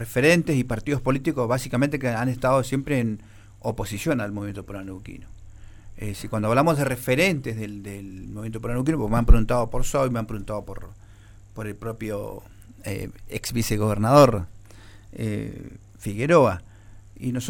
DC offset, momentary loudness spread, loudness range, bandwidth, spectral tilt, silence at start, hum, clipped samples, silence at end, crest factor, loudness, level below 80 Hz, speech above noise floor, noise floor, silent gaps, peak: under 0.1%; 19 LU; 8 LU; 17 kHz; -6 dB/octave; 0 s; none; under 0.1%; 0 s; 20 dB; -24 LUFS; -32 dBFS; 24 dB; -47 dBFS; none; -4 dBFS